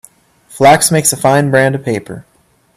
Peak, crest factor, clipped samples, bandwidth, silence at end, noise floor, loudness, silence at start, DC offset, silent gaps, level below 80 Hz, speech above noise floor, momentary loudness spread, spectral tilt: 0 dBFS; 12 dB; under 0.1%; 16 kHz; 0.55 s; -44 dBFS; -11 LUFS; 0.5 s; under 0.1%; none; -52 dBFS; 33 dB; 15 LU; -4 dB/octave